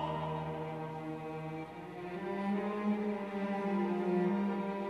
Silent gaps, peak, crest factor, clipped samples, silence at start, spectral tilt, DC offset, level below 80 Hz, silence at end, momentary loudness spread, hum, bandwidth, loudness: none; -22 dBFS; 14 dB; under 0.1%; 0 s; -8.5 dB/octave; under 0.1%; -68 dBFS; 0 s; 10 LU; none; 9 kHz; -37 LUFS